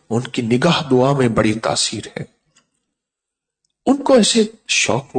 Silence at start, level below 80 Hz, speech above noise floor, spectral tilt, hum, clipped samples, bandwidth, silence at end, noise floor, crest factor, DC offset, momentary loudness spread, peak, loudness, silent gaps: 0.1 s; -50 dBFS; 66 dB; -4 dB/octave; none; under 0.1%; 9.4 kHz; 0 s; -83 dBFS; 14 dB; under 0.1%; 13 LU; -4 dBFS; -16 LUFS; none